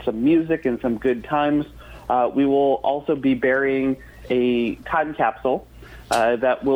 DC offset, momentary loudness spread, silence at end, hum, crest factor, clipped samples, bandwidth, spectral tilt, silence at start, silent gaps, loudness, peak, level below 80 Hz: under 0.1%; 6 LU; 0 s; none; 14 dB; under 0.1%; 15 kHz; -6 dB/octave; 0 s; none; -21 LUFS; -8 dBFS; -48 dBFS